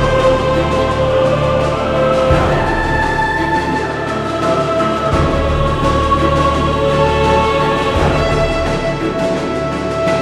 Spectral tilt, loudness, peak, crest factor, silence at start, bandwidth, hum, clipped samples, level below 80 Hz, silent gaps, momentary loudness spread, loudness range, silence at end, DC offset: -6 dB/octave; -14 LUFS; 0 dBFS; 14 dB; 0 s; 12.5 kHz; none; under 0.1%; -24 dBFS; none; 5 LU; 2 LU; 0 s; under 0.1%